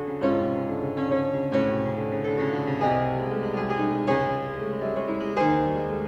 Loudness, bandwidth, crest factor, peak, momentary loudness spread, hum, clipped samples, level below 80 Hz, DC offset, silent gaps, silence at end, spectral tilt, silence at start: -26 LUFS; 8.2 kHz; 16 dB; -10 dBFS; 4 LU; none; under 0.1%; -52 dBFS; under 0.1%; none; 0 s; -8.5 dB/octave; 0 s